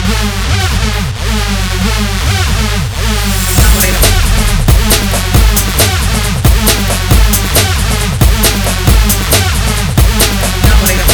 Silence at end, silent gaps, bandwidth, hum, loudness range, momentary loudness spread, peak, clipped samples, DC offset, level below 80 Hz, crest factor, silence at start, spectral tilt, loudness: 0 s; none; over 20 kHz; none; 2 LU; 5 LU; 0 dBFS; 0.3%; under 0.1%; -12 dBFS; 10 dB; 0 s; -3.5 dB/octave; -10 LUFS